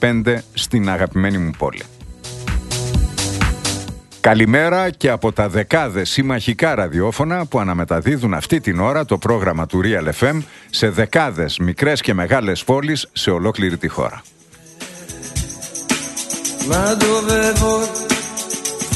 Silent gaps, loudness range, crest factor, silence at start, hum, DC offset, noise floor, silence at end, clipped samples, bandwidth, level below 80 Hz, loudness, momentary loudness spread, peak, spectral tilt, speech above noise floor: none; 5 LU; 18 dB; 0 s; none; under 0.1%; -44 dBFS; 0 s; under 0.1%; 12.5 kHz; -32 dBFS; -18 LUFS; 10 LU; 0 dBFS; -4.5 dB/octave; 27 dB